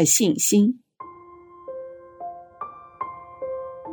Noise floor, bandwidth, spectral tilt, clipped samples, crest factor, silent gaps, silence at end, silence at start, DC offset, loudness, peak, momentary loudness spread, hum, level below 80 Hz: -46 dBFS; 19.5 kHz; -4 dB/octave; under 0.1%; 20 dB; none; 0 s; 0 s; under 0.1%; -22 LUFS; -6 dBFS; 24 LU; none; -66 dBFS